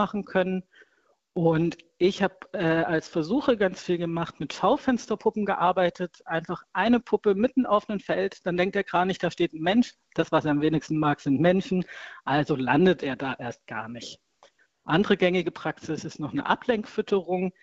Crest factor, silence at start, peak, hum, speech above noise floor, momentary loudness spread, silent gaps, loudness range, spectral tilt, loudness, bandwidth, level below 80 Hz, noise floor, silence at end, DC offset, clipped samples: 20 dB; 0 s; -6 dBFS; none; 35 dB; 11 LU; none; 3 LU; -6.5 dB/octave; -26 LUFS; 8 kHz; -60 dBFS; -61 dBFS; 0.15 s; under 0.1%; under 0.1%